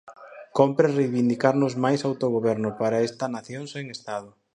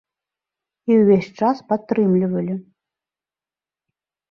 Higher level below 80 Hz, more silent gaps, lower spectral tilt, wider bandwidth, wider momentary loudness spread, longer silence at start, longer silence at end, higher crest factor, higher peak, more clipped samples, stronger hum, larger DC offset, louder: second, -70 dBFS vs -64 dBFS; neither; second, -6.5 dB/octave vs -9.5 dB/octave; first, 10.5 kHz vs 6.8 kHz; about the same, 13 LU vs 13 LU; second, 0.05 s vs 0.85 s; second, 0.25 s vs 1.7 s; about the same, 20 dB vs 18 dB; about the same, -4 dBFS vs -4 dBFS; neither; neither; neither; second, -24 LUFS vs -19 LUFS